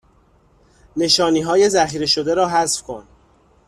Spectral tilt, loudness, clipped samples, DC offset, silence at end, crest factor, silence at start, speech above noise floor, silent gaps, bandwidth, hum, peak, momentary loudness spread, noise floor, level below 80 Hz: -3 dB/octave; -17 LUFS; under 0.1%; under 0.1%; 0.65 s; 18 dB; 0.95 s; 38 dB; none; 13.5 kHz; none; -2 dBFS; 14 LU; -55 dBFS; -52 dBFS